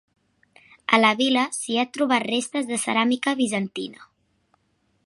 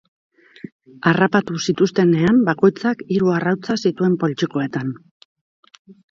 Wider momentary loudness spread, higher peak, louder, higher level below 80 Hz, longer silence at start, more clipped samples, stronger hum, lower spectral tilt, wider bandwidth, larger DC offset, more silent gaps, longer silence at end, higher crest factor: second, 12 LU vs 17 LU; about the same, -2 dBFS vs 0 dBFS; second, -22 LUFS vs -18 LUFS; second, -74 dBFS vs -58 dBFS; second, 0.9 s vs 1.05 s; neither; neither; second, -3 dB/octave vs -6.5 dB/octave; first, 11.5 kHz vs 7.6 kHz; neither; neither; second, 1 s vs 1.15 s; first, 24 dB vs 18 dB